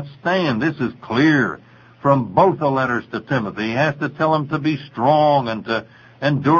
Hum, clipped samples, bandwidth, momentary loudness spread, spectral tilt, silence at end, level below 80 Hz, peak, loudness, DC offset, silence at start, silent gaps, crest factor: none; under 0.1%; 7 kHz; 9 LU; -7.5 dB/octave; 0 s; -56 dBFS; 0 dBFS; -19 LUFS; under 0.1%; 0 s; none; 18 dB